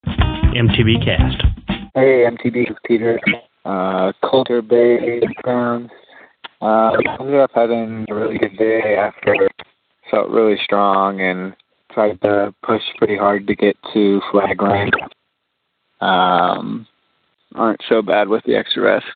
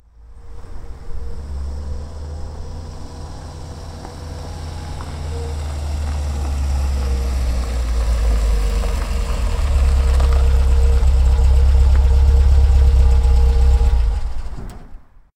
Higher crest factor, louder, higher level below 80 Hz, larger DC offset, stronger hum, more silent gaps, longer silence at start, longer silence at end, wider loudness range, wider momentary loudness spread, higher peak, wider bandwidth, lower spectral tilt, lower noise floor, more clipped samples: about the same, 16 dB vs 12 dB; about the same, -16 LUFS vs -18 LUFS; second, -32 dBFS vs -16 dBFS; neither; neither; neither; second, 0.05 s vs 0.2 s; second, 0 s vs 0.4 s; second, 2 LU vs 16 LU; second, 8 LU vs 19 LU; about the same, -2 dBFS vs -4 dBFS; second, 4.7 kHz vs 10.5 kHz; first, -10 dB/octave vs -6.5 dB/octave; first, -71 dBFS vs -38 dBFS; neither